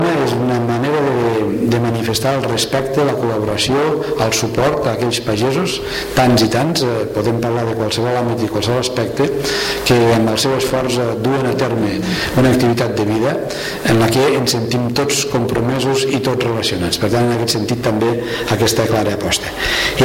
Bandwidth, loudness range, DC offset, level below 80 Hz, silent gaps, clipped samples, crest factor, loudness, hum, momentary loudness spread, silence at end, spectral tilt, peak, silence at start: 16.5 kHz; 1 LU; under 0.1%; -40 dBFS; none; under 0.1%; 14 dB; -16 LUFS; none; 5 LU; 0 s; -5 dB/octave; -2 dBFS; 0 s